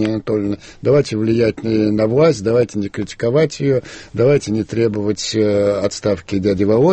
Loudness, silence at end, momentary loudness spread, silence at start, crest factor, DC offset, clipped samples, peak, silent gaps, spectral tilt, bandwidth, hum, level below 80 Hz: -17 LUFS; 0 s; 7 LU; 0 s; 14 dB; under 0.1%; under 0.1%; -2 dBFS; none; -6.5 dB/octave; 8.8 kHz; none; -46 dBFS